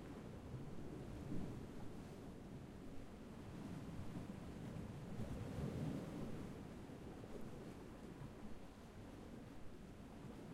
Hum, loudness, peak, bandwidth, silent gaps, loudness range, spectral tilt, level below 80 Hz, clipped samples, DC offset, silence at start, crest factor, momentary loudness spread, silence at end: none; -53 LUFS; -34 dBFS; 16 kHz; none; 6 LU; -7 dB/octave; -60 dBFS; under 0.1%; under 0.1%; 0 s; 16 dB; 9 LU; 0 s